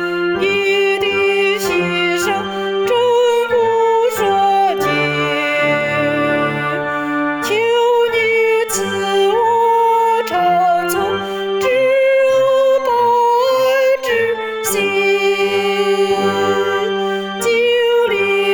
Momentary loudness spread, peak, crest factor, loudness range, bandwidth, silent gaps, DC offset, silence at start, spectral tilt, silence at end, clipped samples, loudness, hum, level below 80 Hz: 5 LU; -6 dBFS; 8 dB; 2 LU; over 20 kHz; none; under 0.1%; 0 s; -3.5 dB/octave; 0 s; under 0.1%; -15 LUFS; none; -54 dBFS